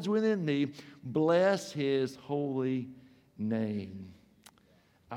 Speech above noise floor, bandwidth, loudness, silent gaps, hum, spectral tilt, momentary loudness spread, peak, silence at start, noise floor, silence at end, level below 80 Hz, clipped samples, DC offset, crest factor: 34 dB; 14.5 kHz; -31 LUFS; none; none; -6.5 dB/octave; 18 LU; -16 dBFS; 0 s; -65 dBFS; 0 s; -74 dBFS; under 0.1%; under 0.1%; 16 dB